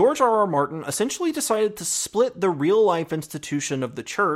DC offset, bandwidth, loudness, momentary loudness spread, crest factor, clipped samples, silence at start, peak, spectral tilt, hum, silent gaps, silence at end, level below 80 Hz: under 0.1%; 16 kHz; -23 LUFS; 9 LU; 16 dB; under 0.1%; 0 s; -6 dBFS; -4 dB/octave; none; none; 0 s; -64 dBFS